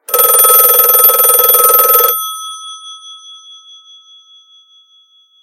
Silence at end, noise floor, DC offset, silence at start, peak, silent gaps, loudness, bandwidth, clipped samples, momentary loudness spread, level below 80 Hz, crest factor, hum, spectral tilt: 2.05 s; -49 dBFS; under 0.1%; 0.1 s; 0 dBFS; none; -5 LUFS; over 20 kHz; 0.5%; 22 LU; -64 dBFS; 12 dB; none; 2.5 dB/octave